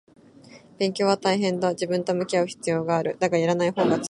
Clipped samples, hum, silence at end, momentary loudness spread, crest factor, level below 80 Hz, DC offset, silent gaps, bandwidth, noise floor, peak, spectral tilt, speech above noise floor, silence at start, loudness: under 0.1%; none; 0 s; 4 LU; 18 dB; -68 dBFS; under 0.1%; none; 11.5 kHz; -49 dBFS; -6 dBFS; -5.5 dB/octave; 26 dB; 0.5 s; -24 LUFS